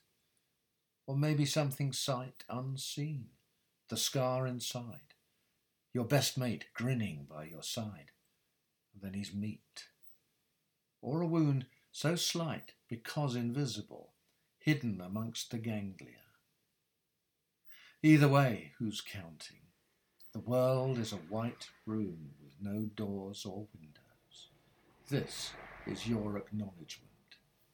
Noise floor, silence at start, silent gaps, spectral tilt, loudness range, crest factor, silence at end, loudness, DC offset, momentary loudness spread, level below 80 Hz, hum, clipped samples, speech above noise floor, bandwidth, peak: -84 dBFS; 1.05 s; none; -5.5 dB/octave; 10 LU; 24 dB; 0.4 s; -36 LUFS; under 0.1%; 19 LU; -72 dBFS; none; under 0.1%; 48 dB; 19 kHz; -14 dBFS